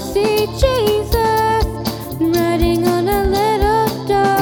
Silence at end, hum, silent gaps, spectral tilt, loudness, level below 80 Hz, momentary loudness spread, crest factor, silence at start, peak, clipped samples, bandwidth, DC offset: 0 s; none; none; -5.5 dB/octave; -16 LUFS; -26 dBFS; 3 LU; 14 dB; 0 s; 0 dBFS; under 0.1%; 20 kHz; under 0.1%